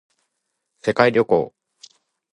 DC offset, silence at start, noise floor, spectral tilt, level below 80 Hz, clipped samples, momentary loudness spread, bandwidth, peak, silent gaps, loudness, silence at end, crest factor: under 0.1%; 0.85 s; -77 dBFS; -6 dB/octave; -60 dBFS; under 0.1%; 11 LU; 10.5 kHz; 0 dBFS; none; -19 LUFS; 0.85 s; 22 dB